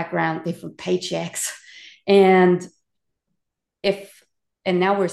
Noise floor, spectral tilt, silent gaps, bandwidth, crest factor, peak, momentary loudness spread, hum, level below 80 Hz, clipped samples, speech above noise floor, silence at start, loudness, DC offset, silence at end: -80 dBFS; -5 dB/octave; none; 12.5 kHz; 18 dB; -4 dBFS; 16 LU; none; -66 dBFS; under 0.1%; 60 dB; 0 s; -21 LUFS; under 0.1%; 0 s